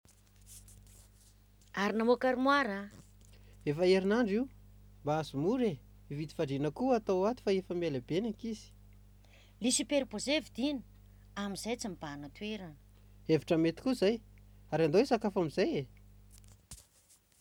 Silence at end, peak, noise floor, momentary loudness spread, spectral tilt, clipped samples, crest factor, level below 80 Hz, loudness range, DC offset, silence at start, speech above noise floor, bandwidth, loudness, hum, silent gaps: 0.65 s; -16 dBFS; -66 dBFS; 18 LU; -5 dB/octave; under 0.1%; 20 dB; -60 dBFS; 4 LU; under 0.1%; 0.5 s; 34 dB; 18.5 kHz; -33 LUFS; 50 Hz at -55 dBFS; none